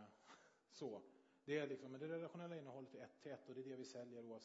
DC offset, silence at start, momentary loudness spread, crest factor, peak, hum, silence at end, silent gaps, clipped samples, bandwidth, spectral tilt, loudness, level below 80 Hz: under 0.1%; 0 s; 18 LU; 20 dB; -34 dBFS; none; 0 s; none; under 0.1%; 7.6 kHz; -5 dB/octave; -53 LUFS; under -90 dBFS